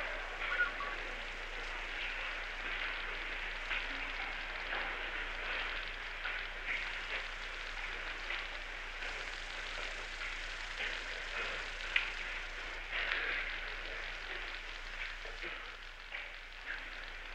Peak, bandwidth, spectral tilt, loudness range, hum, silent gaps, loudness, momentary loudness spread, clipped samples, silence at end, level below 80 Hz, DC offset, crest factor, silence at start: -14 dBFS; 11.5 kHz; -2 dB/octave; 3 LU; none; none; -39 LUFS; 8 LU; under 0.1%; 0 s; -50 dBFS; under 0.1%; 26 dB; 0 s